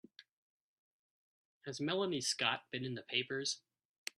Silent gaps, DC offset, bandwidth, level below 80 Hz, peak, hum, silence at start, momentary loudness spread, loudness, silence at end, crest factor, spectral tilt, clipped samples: none; under 0.1%; 12.5 kHz; -84 dBFS; -18 dBFS; none; 1.65 s; 13 LU; -38 LUFS; 0.6 s; 24 dB; -3 dB/octave; under 0.1%